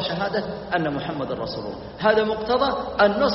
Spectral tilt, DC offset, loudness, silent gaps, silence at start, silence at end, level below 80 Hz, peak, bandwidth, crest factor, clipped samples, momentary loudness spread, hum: -3 dB/octave; under 0.1%; -23 LUFS; none; 0 s; 0 s; -48 dBFS; -4 dBFS; 6 kHz; 18 dB; under 0.1%; 9 LU; none